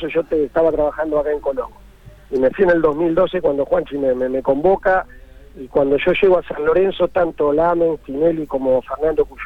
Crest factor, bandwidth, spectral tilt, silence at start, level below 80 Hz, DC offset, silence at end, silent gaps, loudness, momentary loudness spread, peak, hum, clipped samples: 14 dB; 5 kHz; -8 dB/octave; 0 s; -40 dBFS; under 0.1%; 0 s; none; -18 LUFS; 6 LU; -4 dBFS; none; under 0.1%